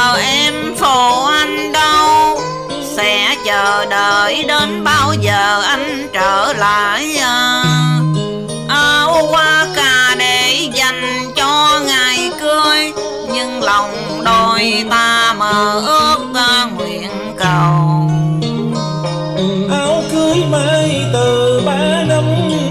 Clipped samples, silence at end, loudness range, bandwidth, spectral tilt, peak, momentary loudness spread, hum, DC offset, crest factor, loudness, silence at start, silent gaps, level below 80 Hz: under 0.1%; 0 s; 3 LU; 16 kHz; -3.5 dB/octave; -2 dBFS; 8 LU; none; 0.3%; 12 dB; -12 LUFS; 0 s; none; -42 dBFS